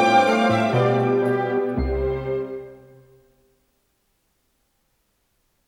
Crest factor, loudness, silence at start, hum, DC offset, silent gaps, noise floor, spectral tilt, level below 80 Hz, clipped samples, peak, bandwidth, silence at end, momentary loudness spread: 18 dB; -21 LUFS; 0 s; none; under 0.1%; none; -69 dBFS; -6.5 dB/octave; -38 dBFS; under 0.1%; -6 dBFS; 11.5 kHz; 2.9 s; 13 LU